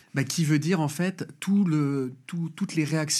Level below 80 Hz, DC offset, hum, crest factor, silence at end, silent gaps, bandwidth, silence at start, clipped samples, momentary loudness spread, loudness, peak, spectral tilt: -82 dBFS; under 0.1%; none; 16 dB; 0 s; none; 14.5 kHz; 0.15 s; under 0.1%; 10 LU; -27 LUFS; -8 dBFS; -5 dB/octave